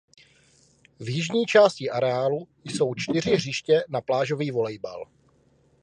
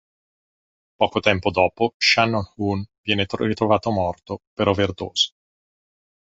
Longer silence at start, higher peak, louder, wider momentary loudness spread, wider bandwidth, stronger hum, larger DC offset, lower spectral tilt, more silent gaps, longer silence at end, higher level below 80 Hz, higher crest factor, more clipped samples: about the same, 1 s vs 1 s; second, -4 dBFS vs 0 dBFS; second, -24 LUFS vs -21 LUFS; first, 16 LU vs 8 LU; first, 10.5 kHz vs 8 kHz; neither; neither; about the same, -5 dB/octave vs -4.5 dB/octave; second, none vs 1.94-2.00 s, 2.98-3.04 s, 4.47-4.57 s; second, 0.8 s vs 1.1 s; second, -64 dBFS vs -46 dBFS; about the same, 22 dB vs 22 dB; neither